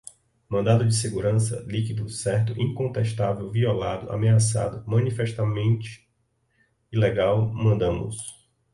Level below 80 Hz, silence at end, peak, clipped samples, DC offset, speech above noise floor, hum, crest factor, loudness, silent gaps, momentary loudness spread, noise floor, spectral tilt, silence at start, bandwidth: -48 dBFS; 0.4 s; -6 dBFS; under 0.1%; under 0.1%; 47 dB; none; 18 dB; -24 LUFS; none; 8 LU; -70 dBFS; -6 dB/octave; 0.5 s; 11.5 kHz